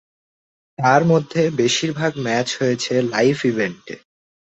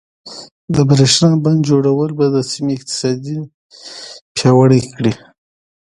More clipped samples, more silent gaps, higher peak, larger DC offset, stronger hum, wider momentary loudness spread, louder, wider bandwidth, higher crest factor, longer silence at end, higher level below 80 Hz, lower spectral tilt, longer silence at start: neither; second, none vs 0.51-0.68 s, 3.54-3.70 s, 4.21-4.35 s; about the same, -2 dBFS vs 0 dBFS; neither; neither; second, 9 LU vs 22 LU; second, -19 LUFS vs -14 LUFS; second, 8.2 kHz vs 11.5 kHz; about the same, 18 dB vs 14 dB; about the same, 0.6 s vs 0.7 s; second, -60 dBFS vs -48 dBFS; about the same, -5 dB/octave vs -5.5 dB/octave; first, 0.8 s vs 0.25 s